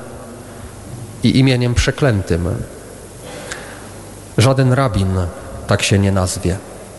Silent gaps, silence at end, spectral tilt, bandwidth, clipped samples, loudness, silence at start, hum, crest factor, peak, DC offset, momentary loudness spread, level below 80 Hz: none; 0 s; -5.5 dB/octave; 12.5 kHz; under 0.1%; -16 LUFS; 0 s; none; 16 dB; -2 dBFS; under 0.1%; 20 LU; -34 dBFS